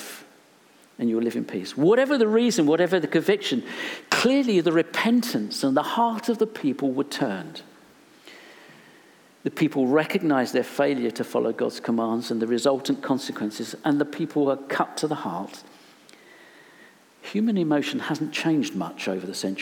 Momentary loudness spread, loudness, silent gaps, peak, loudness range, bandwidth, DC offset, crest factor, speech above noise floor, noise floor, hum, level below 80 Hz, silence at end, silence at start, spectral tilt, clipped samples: 10 LU; -24 LUFS; none; -6 dBFS; 7 LU; 18.5 kHz; under 0.1%; 18 dB; 32 dB; -55 dBFS; none; -80 dBFS; 0 s; 0 s; -5 dB/octave; under 0.1%